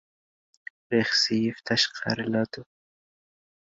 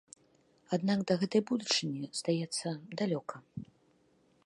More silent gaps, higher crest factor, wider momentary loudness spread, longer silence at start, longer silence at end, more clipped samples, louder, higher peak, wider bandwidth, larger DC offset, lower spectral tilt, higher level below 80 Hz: neither; about the same, 20 dB vs 20 dB; first, 23 LU vs 14 LU; first, 0.9 s vs 0.7 s; first, 1.15 s vs 0.8 s; neither; first, -25 LUFS vs -33 LUFS; first, -10 dBFS vs -16 dBFS; second, 7.8 kHz vs 11.5 kHz; neither; about the same, -4 dB/octave vs -4.5 dB/octave; first, -68 dBFS vs -76 dBFS